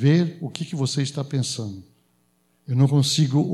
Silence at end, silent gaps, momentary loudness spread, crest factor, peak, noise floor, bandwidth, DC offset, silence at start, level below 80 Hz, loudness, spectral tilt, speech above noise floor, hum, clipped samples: 0 s; none; 12 LU; 16 dB; -6 dBFS; -65 dBFS; 13 kHz; under 0.1%; 0 s; -70 dBFS; -23 LUFS; -5.5 dB/octave; 44 dB; none; under 0.1%